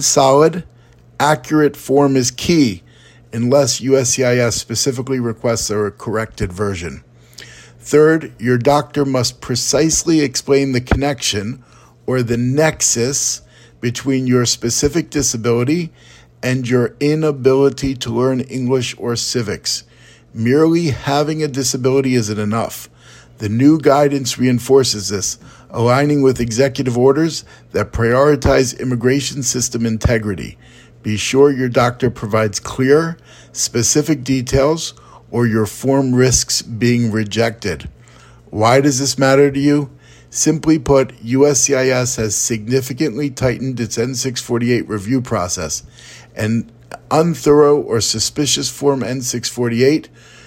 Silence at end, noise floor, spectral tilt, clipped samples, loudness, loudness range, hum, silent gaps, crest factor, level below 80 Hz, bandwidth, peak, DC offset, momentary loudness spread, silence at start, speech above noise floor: 0.4 s; -43 dBFS; -4.5 dB/octave; under 0.1%; -16 LUFS; 3 LU; none; none; 16 dB; -38 dBFS; 16.5 kHz; 0 dBFS; under 0.1%; 10 LU; 0 s; 28 dB